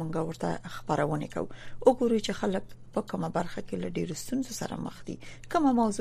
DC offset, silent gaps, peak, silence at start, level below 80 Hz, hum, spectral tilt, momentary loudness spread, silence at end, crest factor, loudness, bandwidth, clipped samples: under 0.1%; none; -8 dBFS; 0 s; -52 dBFS; none; -6 dB/octave; 12 LU; 0 s; 22 dB; -30 LUFS; 15 kHz; under 0.1%